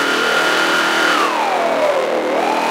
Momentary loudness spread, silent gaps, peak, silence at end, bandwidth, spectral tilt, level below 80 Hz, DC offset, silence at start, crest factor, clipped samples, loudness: 3 LU; none; -2 dBFS; 0 s; 16 kHz; -2 dB/octave; -76 dBFS; under 0.1%; 0 s; 14 dB; under 0.1%; -15 LUFS